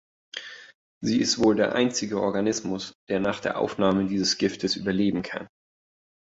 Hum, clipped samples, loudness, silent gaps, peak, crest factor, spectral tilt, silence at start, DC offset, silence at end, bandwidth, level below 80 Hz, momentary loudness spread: none; under 0.1%; -25 LUFS; 0.75-1.01 s, 2.95-3.07 s; -8 dBFS; 18 dB; -4 dB/octave; 0.35 s; under 0.1%; 0.75 s; 8 kHz; -58 dBFS; 16 LU